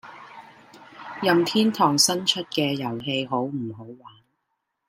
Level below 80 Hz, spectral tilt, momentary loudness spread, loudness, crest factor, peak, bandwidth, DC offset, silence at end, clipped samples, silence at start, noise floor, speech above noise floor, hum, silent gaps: -70 dBFS; -3.5 dB/octave; 23 LU; -22 LUFS; 22 dB; -4 dBFS; 16 kHz; under 0.1%; 0.8 s; under 0.1%; 0.05 s; -78 dBFS; 54 dB; none; none